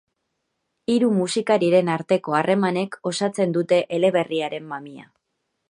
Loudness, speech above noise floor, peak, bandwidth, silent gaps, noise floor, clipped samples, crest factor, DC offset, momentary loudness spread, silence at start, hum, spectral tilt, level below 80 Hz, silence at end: -21 LUFS; 55 dB; -4 dBFS; 11 kHz; none; -76 dBFS; under 0.1%; 18 dB; under 0.1%; 12 LU; 0.9 s; none; -5.5 dB/octave; -70 dBFS; 0.7 s